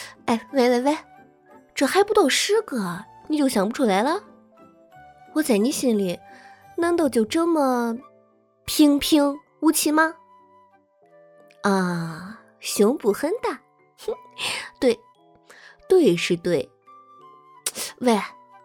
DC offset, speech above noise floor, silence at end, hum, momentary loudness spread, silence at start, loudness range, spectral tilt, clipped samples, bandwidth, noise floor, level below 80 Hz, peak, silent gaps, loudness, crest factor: under 0.1%; 38 dB; 0.3 s; none; 15 LU; 0 s; 4 LU; -4 dB/octave; under 0.1%; 19.5 kHz; -59 dBFS; -60 dBFS; -6 dBFS; none; -22 LUFS; 18 dB